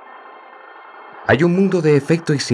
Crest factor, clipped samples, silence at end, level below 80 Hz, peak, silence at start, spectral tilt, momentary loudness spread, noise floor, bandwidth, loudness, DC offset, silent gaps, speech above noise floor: 16 dB; under 0.1%; 0 s; -56 dBFS; -2 dBFS; 0.15 s; -6.5 dB/octave; 9 LU; -40 dBFS; 11.5 kHz; -16 LUFS; under 0.1%; none; 25 dB